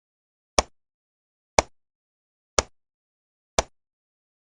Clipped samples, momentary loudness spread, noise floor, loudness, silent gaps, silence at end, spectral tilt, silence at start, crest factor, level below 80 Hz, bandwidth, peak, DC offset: under 0.1%; 20 LU; under -90 dBFS; -26 LUFS; 0.94-1.57 s, 1.95-2.57 s, 2.94-3.57 s; 0.85 s; -2 dB/octave; 0.6 s; 32 dB; -44 dBFS; 10 kHz; 0 dBFS; under 0.1%